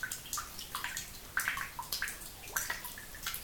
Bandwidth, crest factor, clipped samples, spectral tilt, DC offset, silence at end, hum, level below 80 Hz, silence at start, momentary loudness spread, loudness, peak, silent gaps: 19 kHz; 24 dB; under 0.1%; 0 dB/octave; under 0.1%; 0 s; none; -56 dBFS; 0 s; 6 LU; -38 LUFS; -16 dBFS; none